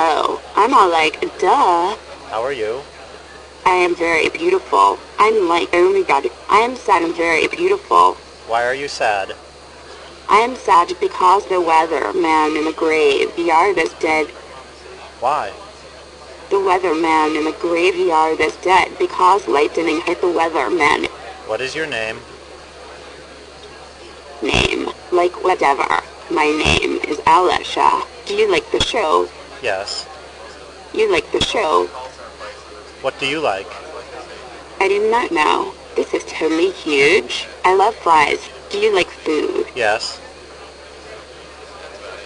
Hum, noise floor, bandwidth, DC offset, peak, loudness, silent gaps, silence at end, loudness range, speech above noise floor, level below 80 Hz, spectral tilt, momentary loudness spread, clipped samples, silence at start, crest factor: none; -38 dBFS; 10.5 kHz; under 0.1%; 0 dBFS; -16 LUFS; none; 0 s; 6 LU; 22 dB; -44 dBFS; -3.5 dB/octave; 22 LU; under 0.1%; 0 s; 18 dB